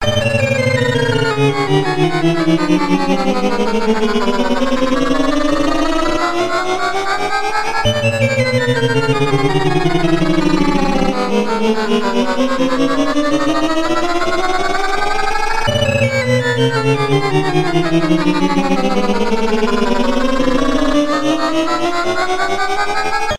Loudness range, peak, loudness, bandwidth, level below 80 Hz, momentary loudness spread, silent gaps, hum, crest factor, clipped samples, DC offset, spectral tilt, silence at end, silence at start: 1 LU; -2 dBFS; -15 LUFS; 13 kHz; -30 dBFS; 3 LU; none; none; 12 dB; under 0.1%; under 0.1%; -5.5 dB/octave; 0 s; 0 s